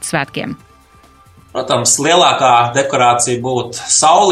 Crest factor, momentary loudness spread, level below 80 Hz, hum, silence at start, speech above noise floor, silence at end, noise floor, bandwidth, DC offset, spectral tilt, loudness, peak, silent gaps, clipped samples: 14 dB; 15 LU; -52 dBFS; none; 0 s; 33 dB; 0 s; -46 dBFS; 15.5 kHz; under 0.1%; -2.5 dB/octave; -12 LUFS; 0 dBFS; none; under 0.1%